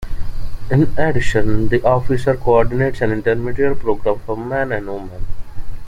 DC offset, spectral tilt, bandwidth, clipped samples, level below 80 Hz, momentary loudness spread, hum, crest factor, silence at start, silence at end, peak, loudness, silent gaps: under 0.1%; -7.5 dB/octave; 9.8 kHz; under 0.1%; -26 dBFS; 17 LU; none; 14 dB; 0 s; 0 s; -2 dBFS; -18 LUFS; none